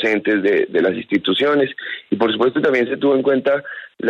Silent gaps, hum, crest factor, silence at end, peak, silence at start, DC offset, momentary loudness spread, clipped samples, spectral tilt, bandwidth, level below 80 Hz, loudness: none; none; 14 dB; 0 s; -4 dBFS; 0 s; under 0.1%; 6 LU; under 0.1%; -6.5 dB/octave; 7.2 kHz; -64 dBFS; -17 LUFS